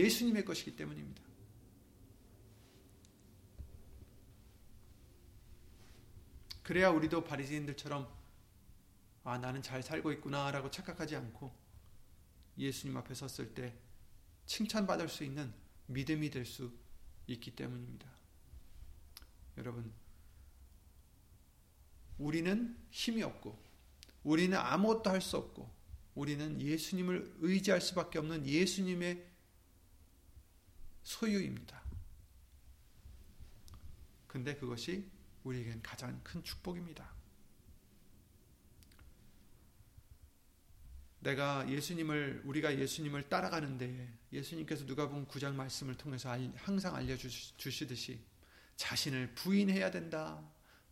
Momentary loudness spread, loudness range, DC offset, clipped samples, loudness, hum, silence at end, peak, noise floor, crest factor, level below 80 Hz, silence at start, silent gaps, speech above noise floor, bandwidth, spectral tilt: 25 LU; 17 LU; under 0.1%; under 0.1%; -39 LUFS; none; 0.15 s; -16 dBFS; -65 dBFS; 24 dB; -60 dBFS; 0 s; none; 27 dB; 16.5 kHz; -5 dB/octave